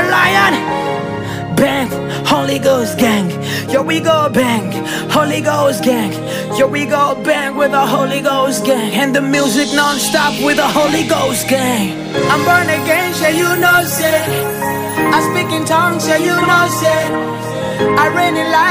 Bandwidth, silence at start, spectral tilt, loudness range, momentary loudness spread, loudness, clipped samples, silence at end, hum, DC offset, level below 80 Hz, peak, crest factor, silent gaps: 16 kHz; 0 s; -4 dB/octave; 2 LU; 7 LU; -13 LUFS; under 0.1%; 0 s; none; under 0.1%; -48 dBFS; -2 dBFS; 12 dB; none